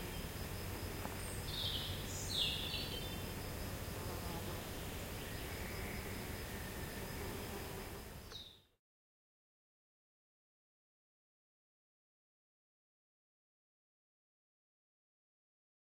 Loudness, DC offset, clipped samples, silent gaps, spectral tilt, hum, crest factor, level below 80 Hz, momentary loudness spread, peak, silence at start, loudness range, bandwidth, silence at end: -43 LUFS; under 0.1%; under 0.1%; none; -3.5 dB/octave; none; 22 dB; -54 dBFS; 7 LU; -24 dBFS; 0 s; 12 LU; 16.5 kHz; 7.3 s